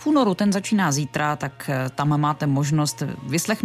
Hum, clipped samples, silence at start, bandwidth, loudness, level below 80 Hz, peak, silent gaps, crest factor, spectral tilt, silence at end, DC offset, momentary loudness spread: none; under 0.1%; 0 s; 15.5 kHz; -22 LUFS; -58 dBFS; -8 dBFS; none; 14 dB; -5.5 dB/octave; 0 s; under 0.1%; 6 LU